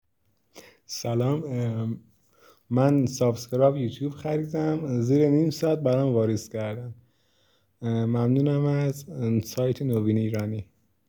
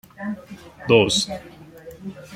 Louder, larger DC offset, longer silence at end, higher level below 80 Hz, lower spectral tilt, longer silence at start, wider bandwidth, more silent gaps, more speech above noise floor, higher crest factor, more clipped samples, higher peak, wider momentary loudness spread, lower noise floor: second, -25 LUFS vs -20 LUFS; neither; first, 0.45 s vs 0 s; second, -66 dBFS vs -54 dBFS; first, -7.5 dB/octave vs -4 dB/octave; first, 0.55 s vs 0.2 s; first, over 20 kHz vs 16 kHz; neither; first, 48 dB vs 20 dB; about the same, 18 dB vs 22 dB; neither; second, -8 dBFS vs -2 dBFS; second, 11 LU vs 26 LU; first, -72 dBFS vs -42 dBFS